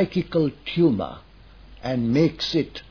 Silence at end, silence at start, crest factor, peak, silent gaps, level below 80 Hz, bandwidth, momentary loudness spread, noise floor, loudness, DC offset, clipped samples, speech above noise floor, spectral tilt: 0.1 s; 0 s; 16 dB; -6 dBFS; none; -48 dBFS; 5.4 kHz; 8 LU; -47 dBFS; -23 LUFS; 0.1%; under 0.1%; 24 dB; -7 dB/octave